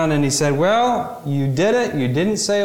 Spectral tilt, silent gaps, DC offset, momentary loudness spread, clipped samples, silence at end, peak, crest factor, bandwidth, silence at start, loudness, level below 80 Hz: -5 dB/octave; none; under 0.1%; 6 LU; under 0.1%; 0 s; -8 dBFS; 10 dB; 17 kHz; 0 s; -18 LUFS; -52 dBFS